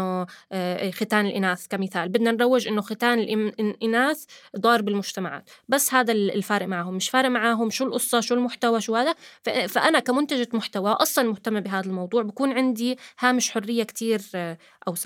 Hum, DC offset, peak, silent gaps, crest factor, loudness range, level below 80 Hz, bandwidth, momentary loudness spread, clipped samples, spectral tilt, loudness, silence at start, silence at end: none; under 0.1%; -4 dBFS; none; 20 dB; 2 LU; -82 dBFS; 17.5 kHz; 9 LU; under 0.1%; -3.5 dB/octave; -24 LUFS; 0 s; 0 s